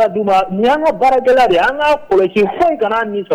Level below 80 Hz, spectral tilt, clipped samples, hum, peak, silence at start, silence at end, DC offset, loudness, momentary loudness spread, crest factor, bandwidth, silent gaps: -44 dBFS; -5.5 dB/octave; under 0.1%; none; -6 dBFS; 0 s; 0 s; under 0.1%; -13 LUFS; 4 LU; 8 dB; 15.5 kHz; none